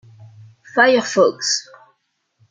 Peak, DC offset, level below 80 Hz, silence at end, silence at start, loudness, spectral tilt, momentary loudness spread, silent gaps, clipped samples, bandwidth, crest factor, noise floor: -2 dBFS; under 0.1%; -72 dBFS; 0.9 s; 0.2 s; -16 LUFS; -2.5 dB/octave; 8 LU; none; under 0.1%; 9.4 kHz; 18 dB; -68 dBFS